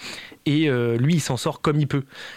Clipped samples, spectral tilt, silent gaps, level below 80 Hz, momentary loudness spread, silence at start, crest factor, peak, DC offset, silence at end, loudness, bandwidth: under 0.1%; -6 dB/octave; none; -54 dBFS; 8 LU; 0 s; 14 dB; -10 dBFS; under 0.1%; 0 s; -22 LUFS; 15 kHz